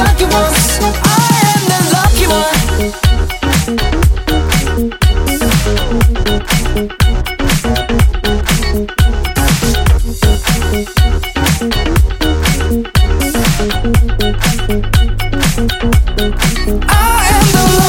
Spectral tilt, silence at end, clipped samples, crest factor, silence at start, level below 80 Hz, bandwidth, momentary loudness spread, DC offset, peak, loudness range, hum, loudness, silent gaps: -4.5 dB/octave; 0 s; under 0.1%; 10 dB; 0 s; -14 dBFS; 17 kHz; 5 LU; under 0.1%; 0 dBFS; 2 LU; none; -12 LUFS; none